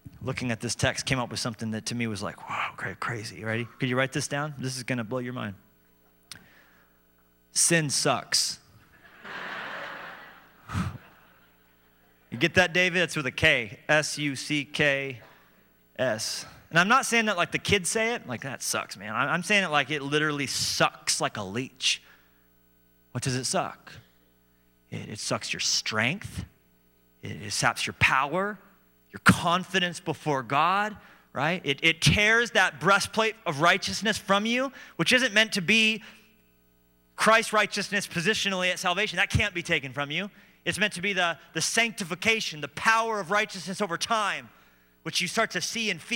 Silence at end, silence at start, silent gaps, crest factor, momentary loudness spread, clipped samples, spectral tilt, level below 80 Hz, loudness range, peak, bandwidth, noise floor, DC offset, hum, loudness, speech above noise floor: 0 s; 0.05 s; none; 22 dB; 14 LU; under 0.1%; -3 dB/octave; -58 dBFS; 8 LU; -6 dBFS; 16.5 kHz; -64 dBFS; under 0.1%; 60 Hz at -60 dBFS; -26 LUFS; 37 dB